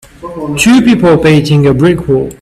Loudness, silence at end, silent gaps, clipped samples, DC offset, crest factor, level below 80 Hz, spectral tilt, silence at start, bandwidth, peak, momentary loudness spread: -8 LUFS; 0.1 s; none; under 0.1%; under 0.1%; 8 dB; -34 dBFS; -6 dB/octave; 0.2 s; 14 kHz; 0 dBFS; 12 LU